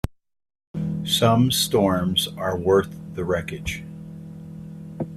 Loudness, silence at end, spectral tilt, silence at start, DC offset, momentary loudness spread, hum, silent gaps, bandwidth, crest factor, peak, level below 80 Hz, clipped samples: -22 LUFS; 0 s; -5 dB/octave; 0.05 s; under 0.1%; 20 LU; none; 0.67-0.74 s; 16 kHz; 20 dB; -4 dBFS; -46 dBFS; under 0.1%